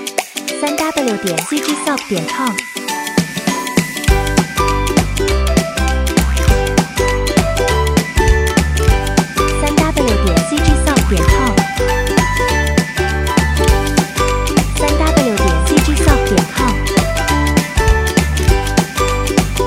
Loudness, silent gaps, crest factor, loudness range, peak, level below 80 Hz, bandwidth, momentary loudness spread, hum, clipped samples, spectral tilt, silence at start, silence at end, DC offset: -14 LUFS; none; 14 dB; 3 LU; 0 dBFS; -18 dBFS; 16.5 kHz; 4 LU; none; under 0.1%; -4.5 dB/octave; 0 s; 0 s; under 0.1%